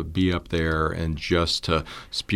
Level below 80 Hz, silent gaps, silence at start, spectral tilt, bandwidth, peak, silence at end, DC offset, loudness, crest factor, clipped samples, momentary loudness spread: -36 dBFS; none; 0 s; -5.5 dB/octave; 13.5 kHz; -8 dBFS; 0 s; under 0.1%; -25 LUFS; 18 dB; under 0.1%; 6 LU